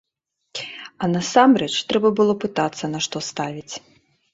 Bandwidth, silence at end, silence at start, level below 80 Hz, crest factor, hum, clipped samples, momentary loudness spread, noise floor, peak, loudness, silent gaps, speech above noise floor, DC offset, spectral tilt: 8 kHz; 0.55 s; 0.55 s; -62 dBFS; 20 dB; none; under 0.1%; 18 LU; -77 dBFS; -2 dBFS; -20 LUFS; none; 58 dB; under 0.1%; -4.5 dB/octave